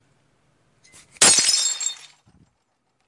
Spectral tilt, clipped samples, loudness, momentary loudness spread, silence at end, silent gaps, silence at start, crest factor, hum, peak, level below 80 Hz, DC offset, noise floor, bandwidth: 1 dB/octave; under 0.1%; -16 LUFS; 15 LU; 1.15 s; none; 1.2 s; 22 dB; none; -2 dBFS; -68 dBFS; under 0.1%; -71 dBFS; 11.5 kHz